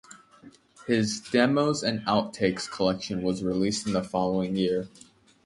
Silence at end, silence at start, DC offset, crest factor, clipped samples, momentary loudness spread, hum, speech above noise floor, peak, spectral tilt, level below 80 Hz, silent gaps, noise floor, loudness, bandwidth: 0.6 s; 0.1 s; under 0.1%; 20 dB; under 0.1%; 6 LU; none; 27 dB; -8 dBFS; -5 dB/octave; -58 dBFS; none; -53 dBFS; -27 LUFS; 11.5 kHz